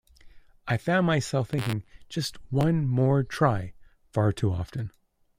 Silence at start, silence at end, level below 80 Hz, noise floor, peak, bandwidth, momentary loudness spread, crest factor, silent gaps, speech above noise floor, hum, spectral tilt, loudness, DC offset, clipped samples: 0.25 s; 0.5 s; -52 dBFS; -50 dBFS; -10 dBFS; 16 kHz; 12 LU; 18 dB; none; 24 dB; none; -6.5 dB/octave; -27 LUFS; under 0.1%; under 0.1%